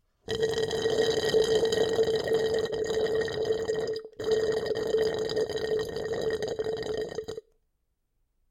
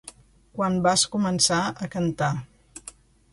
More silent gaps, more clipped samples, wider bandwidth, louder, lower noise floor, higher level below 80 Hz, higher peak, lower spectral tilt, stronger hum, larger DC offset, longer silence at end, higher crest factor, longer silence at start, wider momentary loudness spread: neither; neither; first, 15 kHz vs 11.5 kHz; second, -29 LUFS vs -23 LUFS; first, -76 dBFS vs -49 dBFS; about the same, -56 dBFS vs -54 dBFS; second, -14 dBFS vs -4 dBFS; about the same, -4 dB/octave vs -3.5 dB/octave; neither; neither; first, 1.1 s vs 0.45 s; second, 16 dB vs 22 dB; first, 0.3 s vs 0.05 s; second, 8 LU vs 22 LU